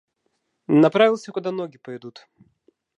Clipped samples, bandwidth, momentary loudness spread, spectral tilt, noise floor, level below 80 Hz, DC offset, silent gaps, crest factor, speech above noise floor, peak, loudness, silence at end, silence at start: under 0.1%; 8.8 kHz; 23 LU; -7 dB/octave; -73 dBFS; -76 dBFS; under 0.1%; none; 22 dB; 52 dB; -2 dBFS; -20 LUFS; 0.9 s; 0.7 s